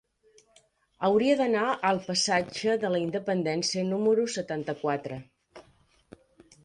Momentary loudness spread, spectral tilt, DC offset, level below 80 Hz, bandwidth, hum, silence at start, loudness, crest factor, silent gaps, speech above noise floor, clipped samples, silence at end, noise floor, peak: 8 LU; -4 dB/octave; under 0.1%; -68 dBFS; 11 kHz; none; 1 s; -27 LUFS; 18 dB; none; 37 dB; under 0.1%; 1.05 s; -64 dBFS; -10 dBFS